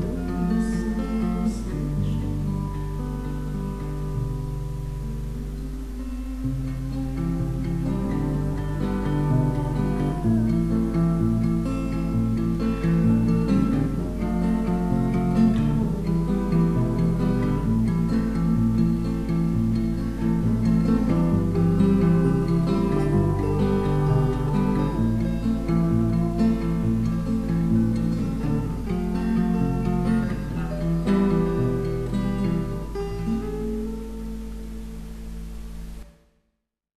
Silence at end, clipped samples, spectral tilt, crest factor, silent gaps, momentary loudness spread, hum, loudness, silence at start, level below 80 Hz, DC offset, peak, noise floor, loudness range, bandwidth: 0.75 s; under 0.1%; -9 dB/octave; 14 dB; none; 10 LU; none; -24 LUFS; 0 s; -32 dBFS; 0.4%; -8 dBFS; -77 dBFS; 9 LU; 13.5 kHz